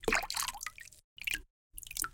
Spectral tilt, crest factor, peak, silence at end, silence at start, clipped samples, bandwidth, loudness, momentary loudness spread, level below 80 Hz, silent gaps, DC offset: -1 dB/octave; 26 dB; -12 dBFS; 0 s; 0 s; under 0.1%; 17 kHz; -36 LUFS; 20 LU; -52 dBFS; 1.04-1.16 s, 1.50-1.70 s; under 0.1%